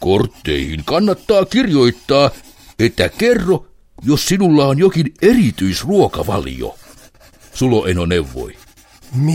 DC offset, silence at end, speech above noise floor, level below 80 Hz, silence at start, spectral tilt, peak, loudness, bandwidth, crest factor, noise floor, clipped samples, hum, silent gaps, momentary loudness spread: under 0.1%; 0 s; 30 dB; -36 dBFS; 0 s; -6 dB/octave; 0 dBFS; -15 LUFS; 16.5 kHz; 14 dB; -44 dBFS; under 0.1%; none; none; 12 LU